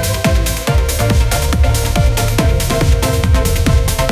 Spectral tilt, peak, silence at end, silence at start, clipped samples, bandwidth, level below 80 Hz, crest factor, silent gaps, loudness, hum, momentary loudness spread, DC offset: -5 dB/octave; 0 dBFS; 0 s; 0 s; under 0.1%; 16 kHz; -16 dBFS; 12 dB; none; -14 LUFS; none; 1 LU; under 0.1%